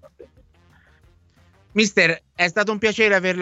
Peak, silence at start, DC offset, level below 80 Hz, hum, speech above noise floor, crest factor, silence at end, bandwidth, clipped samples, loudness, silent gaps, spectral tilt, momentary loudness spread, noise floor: -2 dBFS; 0.2 s; under 0.1%; -58 dBFS; none; 37 dB; 20 dB; 0 s; 8.2 kHz; under 0.1%; -19 LUFS; none; -3.5 dB/octave; 5 LU; -56 dBFS